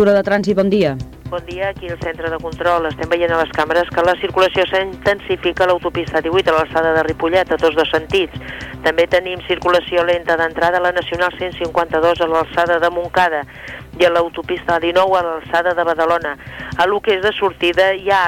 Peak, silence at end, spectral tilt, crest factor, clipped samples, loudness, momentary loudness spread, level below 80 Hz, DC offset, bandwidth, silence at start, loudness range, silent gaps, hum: -4 dBFS; 0 s; -5.5 dB/octave; 12 dB; under 0.1%; -16 LUFS; 9 LU; -40 dBFS; under 0.1%; 17 kHz; 0 s; 1 LU; none; none